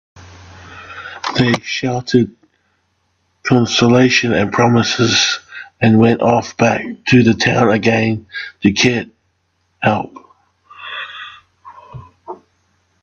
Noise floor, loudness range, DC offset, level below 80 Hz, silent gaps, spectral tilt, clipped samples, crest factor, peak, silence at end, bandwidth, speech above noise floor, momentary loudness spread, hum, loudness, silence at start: -64 dBFS; 12 LU; under 0.1%; -52 dBFS; none; -5 dB/octave; under 0.1%; 16 dB; 0 dBFS; 0.7 s; 7.4 kHz; 50 dB; 22 LU; none; -14 LUFS; 0.6 s